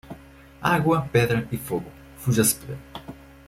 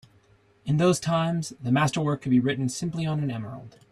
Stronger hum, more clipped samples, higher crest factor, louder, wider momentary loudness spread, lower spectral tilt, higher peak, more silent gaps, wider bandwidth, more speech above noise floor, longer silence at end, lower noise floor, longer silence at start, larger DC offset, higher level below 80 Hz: neither; neither; about the same, 20 dB vs 18 dB; about the same, -23 LUFS vs -25 LUFS; first, 22 LU vs 12 LU; about the same, -5 dB/octave vs -6 dB/octave; first, -4 dBFS vs -8 dBFS; neither; first, 16.5 kHz vs 13 kHz; second, 24 dB vs 35 dB; about the same, 0.25 s vs 0.25 s; second, -47 dBFS vs -60 dBFS; second, 0.05 s vs 0.65 s; neither; first, -50 dBFS vs -58 dBFS